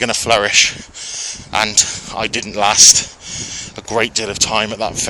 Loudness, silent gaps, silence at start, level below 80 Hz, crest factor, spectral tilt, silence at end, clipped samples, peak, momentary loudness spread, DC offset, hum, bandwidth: -13 LUFS; none; 0 s; -44 dBFS; 16 dB; -0.5 dB/octave; 0 s; 0.3%; 0 dBFS; 19 LU; under 0.1%; none; over 20 kHz